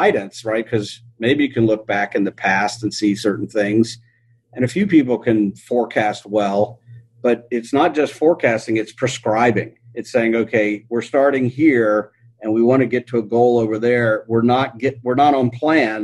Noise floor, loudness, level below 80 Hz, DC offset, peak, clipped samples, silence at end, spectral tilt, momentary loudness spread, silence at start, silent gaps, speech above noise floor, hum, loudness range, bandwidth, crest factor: -54 dBFS; -18 LUFS; -58 dBFS; under 0.1%; -2 dBFS; under 0.1%; 0 s; -6 dB/octave; 8 LU; 0 s; none; 37 dB; none; 2 LU; 12 kHz; 16 dB